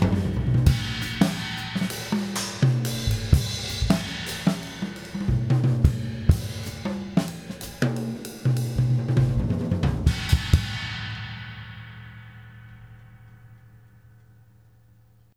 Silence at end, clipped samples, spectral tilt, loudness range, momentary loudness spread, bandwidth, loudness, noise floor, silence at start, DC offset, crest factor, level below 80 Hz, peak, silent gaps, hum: 1.8 s; under 0.1%; -6 dB/octave; 9 LU; 15 LU; 17 kHz; -25 LUFS; -56 dBFS; 0 s; under 0.1%; 24 dB; -34 dBFS; -2 dBFS; none; none